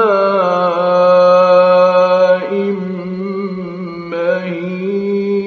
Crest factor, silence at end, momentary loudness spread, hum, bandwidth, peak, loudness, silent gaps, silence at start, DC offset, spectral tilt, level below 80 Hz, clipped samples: 12 dB; 0 s; 13 LU; none; 6.6 kHz; 0 dBFS; -13 LUFS; none; 0 s; under 0.1%; -7.5 dB/octave; -60 dBFS; under 0.1%